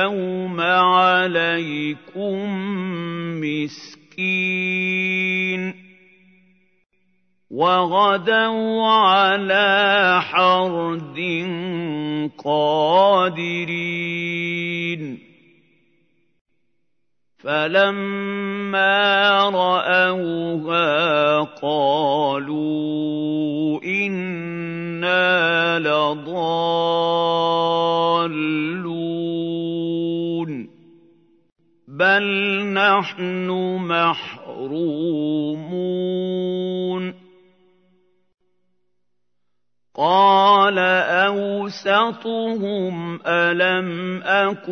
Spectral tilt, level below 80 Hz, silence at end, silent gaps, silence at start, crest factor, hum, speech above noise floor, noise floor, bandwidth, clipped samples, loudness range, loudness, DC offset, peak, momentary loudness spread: -6 dB/octave; -76 dBFS; 0 s; 16.41-16.45 s; 0 s; 18 dB; none; 61 dB; -80 dBFS; 6.6 kHz; under 0.1%; 8 LU; -19 LUFS; under 0.1%; -2 dBFS; 11 LU